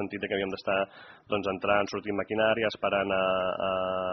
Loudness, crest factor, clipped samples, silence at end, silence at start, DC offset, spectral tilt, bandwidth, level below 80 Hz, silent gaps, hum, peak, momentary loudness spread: -29 LUFS; 20 dB; under 0.1%; 0 s; 0 s; under 0.1%; -2.5 dB/octave; 6.2 kHz; -62 dBFS; none; none; -10 dBFS; 5 LU